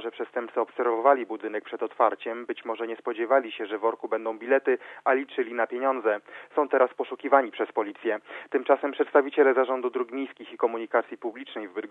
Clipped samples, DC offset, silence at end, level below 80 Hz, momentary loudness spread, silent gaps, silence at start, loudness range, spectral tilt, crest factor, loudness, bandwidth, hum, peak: under 0.1%; under 0.1%; 0.05 s; under -90 dBFS; 11 LU; none; 0 s; 3 LU; -6 dB/octave; 22 dB; -27 LUFS; 4 kHz; none; -6 dBFS